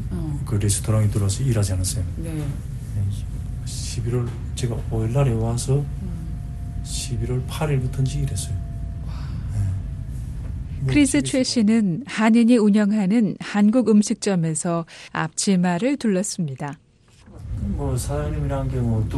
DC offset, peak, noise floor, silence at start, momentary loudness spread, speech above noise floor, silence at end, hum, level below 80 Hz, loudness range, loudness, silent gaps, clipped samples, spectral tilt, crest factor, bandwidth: under 0.1%; -6 dBFS; -49 dBFS; 0 s; 14 LU; 29 dB; 0 s; none; -34 dBFS; 8 LU; -22 LUFS; none; under 0.1%; -6 dB/octave; 16 dB; 12.5 kHz